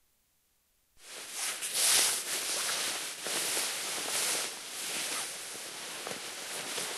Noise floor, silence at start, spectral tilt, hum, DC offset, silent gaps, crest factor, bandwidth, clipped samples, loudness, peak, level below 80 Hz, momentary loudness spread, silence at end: -73 dBFS; 0.95 s; 1.5 dB/octave; none; under 0.1%; none; 22 dB; 16 kHz; under 0.1%; -31 LUFS; -12 dBFS; -82 dBFS; 14 LU; 0 s